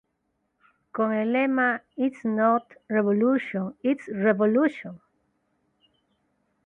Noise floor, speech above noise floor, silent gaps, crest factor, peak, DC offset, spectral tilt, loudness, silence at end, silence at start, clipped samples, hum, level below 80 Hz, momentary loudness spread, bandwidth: -75 dBFS; 51 dB; none; 16 dB; -10 dBFS; under 0.1%; -8.5 dB/octave; -24 LUFS; 1.7 s; 0.95 s; under 0.1%; none; -72 dBFS; 7 LU; 4 kHz